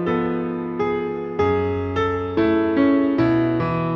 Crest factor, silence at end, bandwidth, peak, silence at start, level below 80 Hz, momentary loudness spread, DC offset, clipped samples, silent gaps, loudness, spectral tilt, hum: 12 dB; 0 s; 6.4 kHz; -8 dBFS; 0 s; -48 dBFS; 7 LU; under 0.1%; under 0.1%; none; -21 LUFS; -9 dB/octave; none